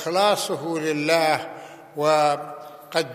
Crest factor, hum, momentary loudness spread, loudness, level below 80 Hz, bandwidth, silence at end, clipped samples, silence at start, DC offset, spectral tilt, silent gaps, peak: 20 dB; none; 18 LU; -22 LUFS; -78 dBFS; 15 kHz; 0 s; under 0.1%; 0 s; under 0.1%; -3.5 dB/octave; none; -4 dBFS